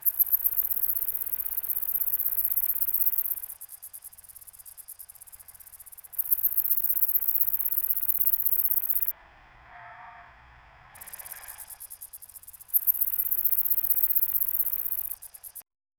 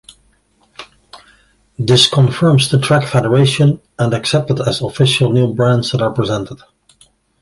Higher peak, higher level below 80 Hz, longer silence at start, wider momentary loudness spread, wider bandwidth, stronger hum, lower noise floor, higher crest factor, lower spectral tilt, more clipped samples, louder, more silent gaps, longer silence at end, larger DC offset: second, -6 dBFS vs 0 dBFS; second, -62 dBFS vs -46 dBFS; second, 0 s vs 0.8 s; first, 22 LU vs 8 LU; first, over 20 kHz vs 11.5 kHz; neither; about the same, -54 dBFS vs -56 dBFS; first, 24 dB vs 14 dB; second, 0 dB/octave vs -5.5 dB/octave; neither; second, -23 LUFS vs -13 LUFS; neither; second, 0.35 s vs 0.85 s; neither